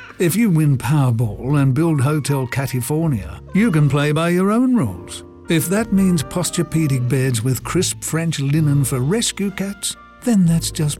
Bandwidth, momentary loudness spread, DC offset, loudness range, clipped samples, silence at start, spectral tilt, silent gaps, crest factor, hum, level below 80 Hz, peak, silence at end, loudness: 17 kHz; 8 LU; under 0.1%; 1 LU; under 0.1%; 0 s; -5.5 dB/octave; none; 12 dB; none; -42 dBFS; -6 dBFS; 0.05 s; -18 LUFS